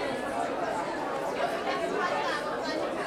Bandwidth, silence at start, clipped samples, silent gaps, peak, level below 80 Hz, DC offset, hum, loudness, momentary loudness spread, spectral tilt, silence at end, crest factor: 16.5 kHz; 0 s; under 0.1%; none; -16 dBFS; -62 dBFS; under 0.1%; none; -31 LUFS; 3 LU; -4 dB/octave; 0 s; 14 dB